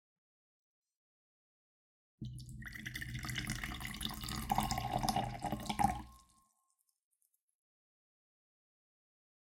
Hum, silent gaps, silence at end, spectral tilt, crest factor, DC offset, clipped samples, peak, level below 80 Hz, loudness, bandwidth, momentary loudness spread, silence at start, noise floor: none; none; 3.3 s; -4 dB/octave; 28 dB; under 0.1%; under 0.1%; -16 dBFS; -54 dBFS; -40 LUFS; 17 kHz; 13 LU; 2.2 s; -81 dBFS